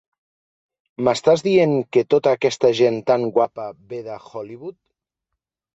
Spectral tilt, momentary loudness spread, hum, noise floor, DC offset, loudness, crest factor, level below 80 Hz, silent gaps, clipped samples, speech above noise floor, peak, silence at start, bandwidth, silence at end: -5.5 dB/octave; 17 LU; none; -82 dBFS; under 0.1%; -18 LUFS; 18 dB; -62 dBFS; none; under 0.1%; 63 dB; -4 dBFS; 1 s; 8.2 kHz; 1.05 s